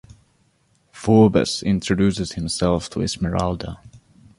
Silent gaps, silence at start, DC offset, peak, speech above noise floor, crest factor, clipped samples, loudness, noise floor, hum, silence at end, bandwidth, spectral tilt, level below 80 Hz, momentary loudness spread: none; 0.95 s; under 0.1%; -2 dBFS; 43 dB; 20 dB; under 0.1%; -20 LUFS; -62 dBFS; none; 0.4 s; 11.5 kHz; -6 dB/octave; -40 dBFS; 14 LU